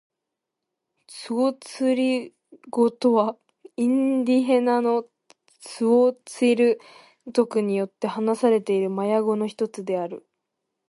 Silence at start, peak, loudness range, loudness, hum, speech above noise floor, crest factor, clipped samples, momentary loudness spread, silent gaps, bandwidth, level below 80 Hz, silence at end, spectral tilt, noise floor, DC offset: 1.1 s; -6 dBFS; 3 LU; -23 LUFS; none; 62 dB; 16 dB; under 0.1%; 11 LU; none; 11.5 kHz; -76 dBFS; 0.7 s; -6 dB/octave; -84 dBFS; under 0.1%